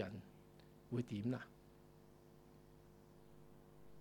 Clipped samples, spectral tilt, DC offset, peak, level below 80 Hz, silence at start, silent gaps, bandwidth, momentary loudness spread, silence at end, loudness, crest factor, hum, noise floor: under 0.1%; -7.5 dB/octave; under 0.1%; -28 dBFS; -74 dBFS; 0 s; none; 19 kHz; 21 LU; 0 s; -46 LUFS; 22 dB; 50 Hz at -70 dBFS; -65 dBFS